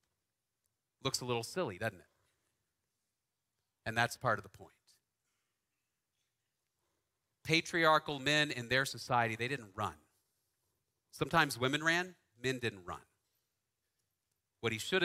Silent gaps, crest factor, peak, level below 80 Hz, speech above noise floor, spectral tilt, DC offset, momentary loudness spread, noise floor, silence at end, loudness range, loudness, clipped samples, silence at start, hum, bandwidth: none; 26 dB; -12 dBFS; -70 dBFS; 54 dB; -4 dB/octave; under 0.1%; 11 LU; -89 dBFS; 0 s; 9 LU; -34 LUFS; under 0.1%; 1.05 s; none; 16 kHz